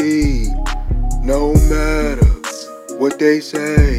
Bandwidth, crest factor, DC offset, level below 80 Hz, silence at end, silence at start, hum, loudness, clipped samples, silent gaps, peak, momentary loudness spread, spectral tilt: 15 kHz; 14 dB; under 0.1%; -18 dBFS; 0 s; 0 s; none; -17 LUFS; under 0.1%; none; 0 dBFS; 10 LU; -6.5 dB/octave